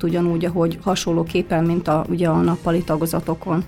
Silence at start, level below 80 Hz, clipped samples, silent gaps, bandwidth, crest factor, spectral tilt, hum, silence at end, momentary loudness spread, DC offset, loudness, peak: 0 s; -42 dBFS; under 0.1%; none; 16 kHz; 14 dB; -6.5 dB/octave; none; 0 s; 3 LU; under 0.1%; -20 LUFS; -6 dBFS